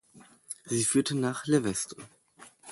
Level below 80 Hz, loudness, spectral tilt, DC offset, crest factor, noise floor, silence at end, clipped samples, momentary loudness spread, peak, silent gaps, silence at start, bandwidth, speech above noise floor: -66 dBFS; -28 LUFS; -4 dB/octave; under 0.1%; 18 dB; -57 dBFS; 0 s; under 0.1%; 18 LU; -12 dBFS; none; 0.15 s; 12 kHz; 28 dB